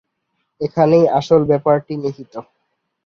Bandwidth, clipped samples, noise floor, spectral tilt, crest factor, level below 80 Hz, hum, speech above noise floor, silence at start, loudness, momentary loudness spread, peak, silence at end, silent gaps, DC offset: 7 kHz; under 0.1%; -71 dBFS; -8 dB/octave; 16 dB; -56 dBFS; none; 56 dB; 0.6 s; -16 LUFS; 20 LU; -2 dBFS; 0.65 s; none; under 0.1%